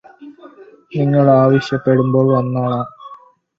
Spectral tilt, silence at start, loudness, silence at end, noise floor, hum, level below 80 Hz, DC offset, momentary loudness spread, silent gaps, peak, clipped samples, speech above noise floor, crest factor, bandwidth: -9 dB/octave; 0.2 s; -15 LUFS; 0.4 s; -42 dBFS; none; -56 dBFS; under 0.1%; 11 LU; none; 0 dBFS; under 0.1%; 29 dB; 16 dB; 7.2 kHz